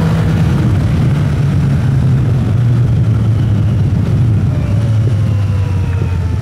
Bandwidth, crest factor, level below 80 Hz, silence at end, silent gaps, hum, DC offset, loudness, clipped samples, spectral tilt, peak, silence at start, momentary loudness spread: 10.5 kHz; 10 dB; -26 dBFS; 0 s; none; none; under 0.1%; -13 LUFS; under 0.1%; -8.5 dB/octave; -2 dBFS; 0 s; 3 LU